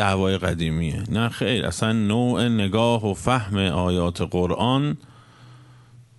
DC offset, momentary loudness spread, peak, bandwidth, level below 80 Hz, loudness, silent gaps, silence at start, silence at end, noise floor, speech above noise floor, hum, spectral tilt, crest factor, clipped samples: under 0.1%; 4 LU; -4 dBFS; 11.5 kHz; -44 dBFS; -22 LUFS; none; 0 s; 0.2 s; -49 dBFS; 27 dB; none; -6 dB/octave; 20 dB; under 0.1%